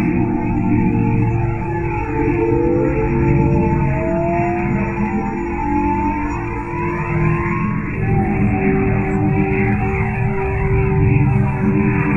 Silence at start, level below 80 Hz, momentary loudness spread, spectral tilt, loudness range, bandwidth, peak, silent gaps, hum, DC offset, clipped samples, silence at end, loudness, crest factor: 0 s; -28 dBFS; 6 LU; -10.5 dB/octave; 3 LU; 7.4 kHz; -2 dBFS; none; none; under 0.1%; under 0.1%; 0 s; -18 LUFS; 14 dB